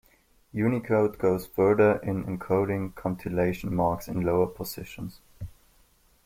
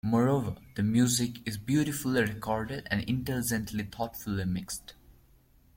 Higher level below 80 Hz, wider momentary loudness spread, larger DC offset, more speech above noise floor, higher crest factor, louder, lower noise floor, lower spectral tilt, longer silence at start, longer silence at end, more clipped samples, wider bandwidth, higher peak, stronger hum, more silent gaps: about the same, -52 dBFS vs -54 dBFS; first, 17 LU vs 10 LU; neither; first, 36 dB vs 32 dB; about the same, 18 dB vs 18 dB; first, -27 LUFS vs -30 LUFS; about the same, -62 dBFS vs -61 dBFS; first, -7.5 dB/octave vs -5 dB/octave; first, 0.55 s vs 0.05 s; about the same, 0.75 s vs 0.65 s; neither; about the same, 16.5 kHz vs 16.5 kHz; first, -10 dBFS vs -14 dBFS; neither; neither